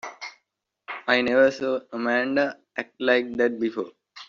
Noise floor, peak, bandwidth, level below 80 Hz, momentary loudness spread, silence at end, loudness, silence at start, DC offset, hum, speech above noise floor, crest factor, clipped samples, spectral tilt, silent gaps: -78 dBFS; -6 dBFS; 7.4 kHz; -68 dBFS; 17 LU; 0.05 s; -24 LUFS; 0.05 s; under 0.1%; none; 55 dB; 18 dB; under 0.1%; -2 dB/octave; none